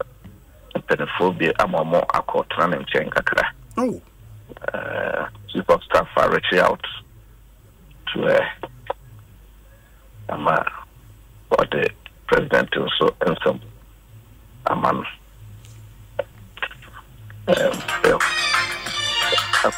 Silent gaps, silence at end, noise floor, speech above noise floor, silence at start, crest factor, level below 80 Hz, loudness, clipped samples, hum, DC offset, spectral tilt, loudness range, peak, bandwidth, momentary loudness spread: none; 0 s; -48 dBFS; 28 dB; 0 s; 18 dB; -48 dBFS; -21 LUFS; under 0.1%; none; under 0.1%; -4 dB/octave; 6 LU; -4 dBFS; 16 kHz; 15 LU